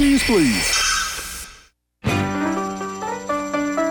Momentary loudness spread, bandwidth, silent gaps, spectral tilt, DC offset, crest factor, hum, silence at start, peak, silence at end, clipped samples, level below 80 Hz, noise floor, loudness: 12 LU; 19.5 kHz; none; -3.5 dB/octave; under 0.1%; 14 dB; none; 0 s; -6 dBFS; 0 s; under 0.1%; -38 dBFS; -51 dBFS; -20 LUFS